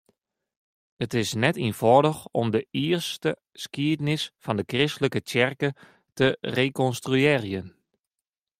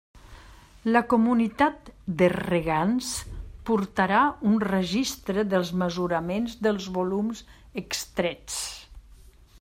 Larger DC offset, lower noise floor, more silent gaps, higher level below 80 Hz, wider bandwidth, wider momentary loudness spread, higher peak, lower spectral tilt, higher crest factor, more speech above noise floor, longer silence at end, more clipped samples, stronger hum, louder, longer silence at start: neither; first, -89 dBFS vs -51 dBFS; neither; second, -62 dBFS vs -50 dBFS; about the same, 16 kHz vs 16 kHz; second, 9 LU vs 13 LU; about the same, -4 dBFS vs -6 dBFS; about the same, -5.5 dB/octave vs -5 dB/octave; about the same, 22 dB vs 20 dB; first, 64 dB vs 26 dB; first, 0.9 s vs 0.6 s; neither; neither; about the same, -25 LUFS vs -26 LUFS; first, 1 s vs 0.15 s